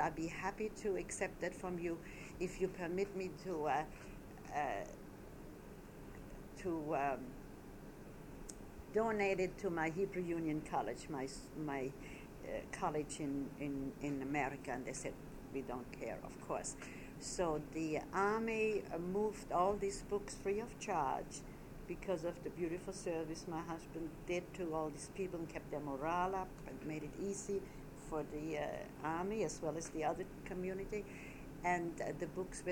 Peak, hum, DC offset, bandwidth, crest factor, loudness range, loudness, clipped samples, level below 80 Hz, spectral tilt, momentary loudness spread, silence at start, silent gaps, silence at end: -22 dBFS; none; under 0.1%; 19 kHz; 20 dB; 5 LU; -42 LUFS; under 0.1%; -58 dBFS; -5 dB/octave; 14 LU; 0 s; none; 0 s